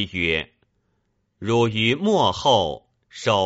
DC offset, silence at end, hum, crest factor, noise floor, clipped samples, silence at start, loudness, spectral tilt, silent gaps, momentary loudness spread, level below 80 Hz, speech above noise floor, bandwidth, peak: under 0.1%; 0 s; none; 18 dB; -70 dBFS; under 0.1%; 0 s; -21 LUFS; -3 dB/octave; none; 13 LU; -50 dBFS; 50 dB; 8 kHz; -4 dBFS